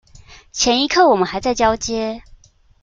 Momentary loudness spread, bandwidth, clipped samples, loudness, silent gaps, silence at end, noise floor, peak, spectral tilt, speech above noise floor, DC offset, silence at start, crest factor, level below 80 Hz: 14 LU; 9.4 kHz; under 0.1%; -17 LUFS; none; 0.6 s; -48 dBFS; -2 dBFS; -2.5 dB/octave; 31 dB; under 0.1%; 0.3 s; 16 dB; -42 dBFS